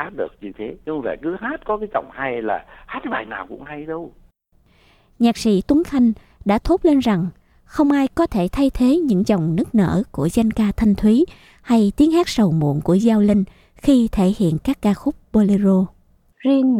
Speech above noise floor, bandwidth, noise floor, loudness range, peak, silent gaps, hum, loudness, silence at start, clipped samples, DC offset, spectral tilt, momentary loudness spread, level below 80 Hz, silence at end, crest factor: 40 dB; 15 kHz; -57 dBFS; 9 LU; -4 dBFS; none; none; -19 LUFS; 0 s; under 0.1%; under 0.1%; -7 dB/octave; 13 LU; -38 dBFS; 0 s; 14 dB